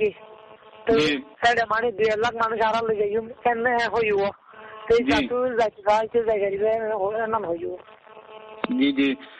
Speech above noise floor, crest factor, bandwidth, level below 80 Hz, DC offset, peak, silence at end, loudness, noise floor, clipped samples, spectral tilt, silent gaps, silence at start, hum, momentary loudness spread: 24 dB; 18 dB; 8.6 kHz; -54 dBFS; under 0.1%; -6 dBFS; 0.05 s; -23 LUFS; -47 dBFS; under 0.1%; -5 dB/octave; none; 0 s; none; 10 LU